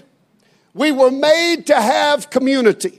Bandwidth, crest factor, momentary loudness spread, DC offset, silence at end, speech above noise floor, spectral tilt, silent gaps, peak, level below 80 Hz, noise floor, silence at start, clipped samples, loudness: 15.5 kHz; 14 dB; 4 LU; under 0.1%; 0.1 s; 43 dB; -3 dB/octave; none; 0 dBFS; -74 dBFS; -57 dBFS; 0.75 s; under 0.1%; -14 LUFS